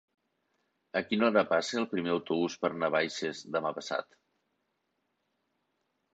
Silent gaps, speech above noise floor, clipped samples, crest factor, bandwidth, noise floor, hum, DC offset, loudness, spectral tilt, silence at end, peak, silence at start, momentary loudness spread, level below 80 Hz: none; 49 dB; under 0.1%; 22 dB; 9 kHz; -80 dBFS; none; under 0.1%; -31 LUFS; -4.5 dB/octave; 2.1 s; -12 dBFS; 0.95 s; 9 LU; -74 dBFS